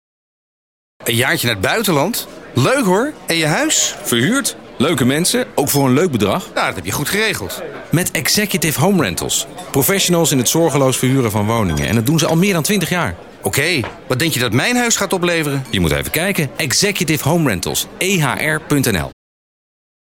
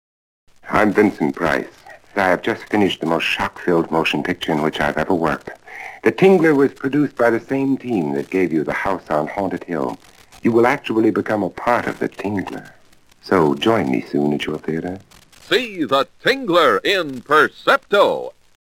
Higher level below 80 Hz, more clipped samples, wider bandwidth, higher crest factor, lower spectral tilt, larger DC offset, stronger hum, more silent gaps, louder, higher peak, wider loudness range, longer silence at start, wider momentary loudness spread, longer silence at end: first, -42 dBFS vs -52 dBFS; neither; about the same, 17 kHz vs 17 kHz; about the same, 14 dB vs 18 dB; second, -4 dB/octave vs -5.5 dB/octave; first, 0.2% vs under 0.1%; neither; neither; about the same, -16 LUFS vs -18 LUFS; about the same, -2 dBFS vs 0 dBFS; about the same, 2 LU vs 3 LU; first, 1 s vs 0.65 s; second, 6 LU vs 10 LU; first, 1 s vs 0.45 s